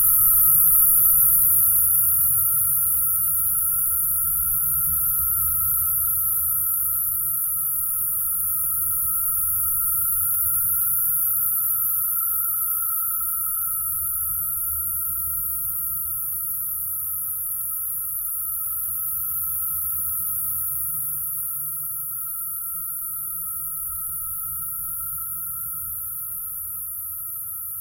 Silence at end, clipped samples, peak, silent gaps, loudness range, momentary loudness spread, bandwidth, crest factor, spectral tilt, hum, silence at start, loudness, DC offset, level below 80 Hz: 0 s; under 0.1%; -4 dBFS; none; 9 LU; 12 LU; 16 kHz; 20 dB; -1.5 dB/octave; none; 0 s; -20 LUFS; under 0.1%; -48 dBFS